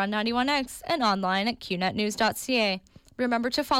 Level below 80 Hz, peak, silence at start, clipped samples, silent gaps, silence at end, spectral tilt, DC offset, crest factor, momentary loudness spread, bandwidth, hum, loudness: -58 dBFS; -14 dBFS; 0 s; under 0.1%; none; 0 s; -4 dB/octave; under 0.1%; 14 dB; 4 LU; 16.5 kHz; none; -26 LUFS